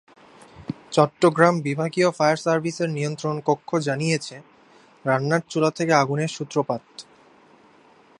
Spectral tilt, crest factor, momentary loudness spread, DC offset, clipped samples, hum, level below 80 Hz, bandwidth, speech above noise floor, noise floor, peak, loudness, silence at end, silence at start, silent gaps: -5.5 dB/octave; 22 dB; 12 LU; under 0.1%; under 0.1%; none; -66 dBFS; 11 kHz; 32 dB; -54 dBFS; 0 dBFS; -22 LUFS; 1.15 s; 0.55 s; none